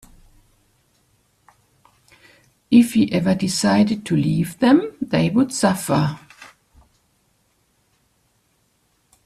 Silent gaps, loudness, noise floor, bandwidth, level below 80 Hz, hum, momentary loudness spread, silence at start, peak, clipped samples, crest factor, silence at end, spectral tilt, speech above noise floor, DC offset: none; -18 LUFS; -65 dBFS; 14 kHz; -54 dBFS; none; 6 LU; 2.7 s; -2 dBFS; under 0.1%; 20 dB; 2.8 s; -5.5 dB/octave; 47 dB; under 0.1%